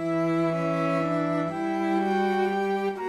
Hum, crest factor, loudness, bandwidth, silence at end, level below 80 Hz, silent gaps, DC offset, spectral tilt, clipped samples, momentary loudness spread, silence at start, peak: none; 12 dB; -26 LUFS; 12.5 kHz; 0 s; -68 dBFS; none; under 0.1%; -7.5 dB/octave; under 0.1%; 3 LU; 0 s; -14 dBFS